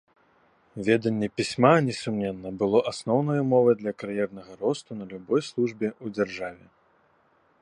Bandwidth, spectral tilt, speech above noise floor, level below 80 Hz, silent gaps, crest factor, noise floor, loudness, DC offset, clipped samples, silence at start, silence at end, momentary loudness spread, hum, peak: 10.5 kHz; -6.5 dB/octave; 39 dB; -64 dBFS; none; 22 dB; -64 dBFS; -26 LUFS; under 0.1%; under 0.1%; 0.75 s; 1.05 s; 12 LU; none; -4 dBFS